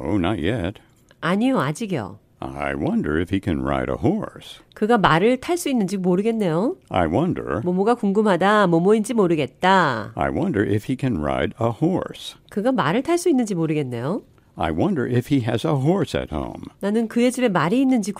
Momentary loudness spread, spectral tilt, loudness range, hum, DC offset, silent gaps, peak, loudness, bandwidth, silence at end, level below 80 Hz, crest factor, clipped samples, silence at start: 11 LU; -6.5 dB/octave; 5 LU; none; under 0.1%; none; -2 dBFS; -21 LUFS; 15.5 kHz; 0 s; -44 dBFS; 18 dB; under 0.1%; 0 s